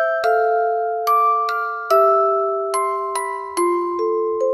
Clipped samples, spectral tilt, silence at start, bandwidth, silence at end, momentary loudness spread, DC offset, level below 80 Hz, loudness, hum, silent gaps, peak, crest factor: under 0.1%; -2 dB/octave; 0 s; 15 kHz; 0 s; 7 LU; under 0.1%; -68 dBFS; -19 LUFS; none; none; -4 dBFS; 14 dB